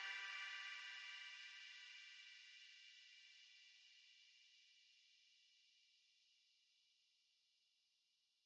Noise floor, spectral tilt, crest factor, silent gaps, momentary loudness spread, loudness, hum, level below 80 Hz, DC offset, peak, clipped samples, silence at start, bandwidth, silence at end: -85 dBFS; 5 dB/octave; 22 dB; none; 18 LU; -55 LUFS; none; under -90 dBFS; under 0.1%; -38 dBFS; under 0.1%; 0 s; 8.8 kHz; 0.85 s